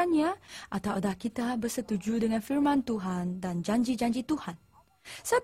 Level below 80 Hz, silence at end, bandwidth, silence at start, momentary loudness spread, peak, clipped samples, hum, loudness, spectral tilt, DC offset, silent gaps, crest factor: -60 dBFS; 0 s; 16 kHz; 0 s; 11 LU; -14 dBFS; under 0.1%; none; -31 LUFS; -5.5 dB/octave; under 0.1%; none; 16 dB